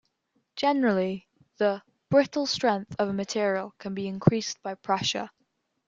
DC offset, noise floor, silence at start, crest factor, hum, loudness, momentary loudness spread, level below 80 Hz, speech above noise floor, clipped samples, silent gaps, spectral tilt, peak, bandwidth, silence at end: under 0.1%; -75 dBFS; 0.55 s; 26 dB; none; -27 LUFS; 11 LU; -64 dBFS; 48 dB; under 0.1%; none; -5 dB/octave; -2 dBFS; 7.8 kHz; 0.6 s